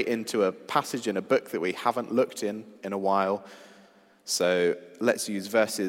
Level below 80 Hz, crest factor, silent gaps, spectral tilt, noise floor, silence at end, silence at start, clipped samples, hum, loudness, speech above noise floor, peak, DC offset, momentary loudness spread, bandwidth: -82 dBFS; 20 dB; none; -4 dB/octave; -57 dBFS; 0 s; 0 s; under 0.1%; none; -27 LUFS; 30 dB; -8 dBFS; under 0.1%; 9 LU; 16 kHz